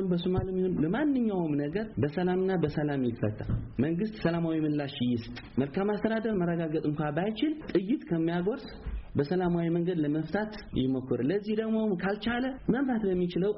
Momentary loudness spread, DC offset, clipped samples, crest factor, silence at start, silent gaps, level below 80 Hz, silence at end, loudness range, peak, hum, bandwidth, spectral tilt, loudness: 5 LU; under 0.1%; under 0.1%; 14 dB; 0 s; none; -48 dBFS; 0 s; 1 LU; -16 dBFS; none; 5.8 kHz; -6.5 dB/octave; -30 LUFS